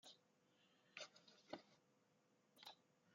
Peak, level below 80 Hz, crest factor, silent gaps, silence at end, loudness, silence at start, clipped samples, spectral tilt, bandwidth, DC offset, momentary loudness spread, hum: -36 dBFS; under -90 dBFS; 28 dB; none; 0 s; -61 LUFS; 0.05 s; under 0.1%; -1 dB/octave; 7.2 kHz; under 0.1%; 7 LU; none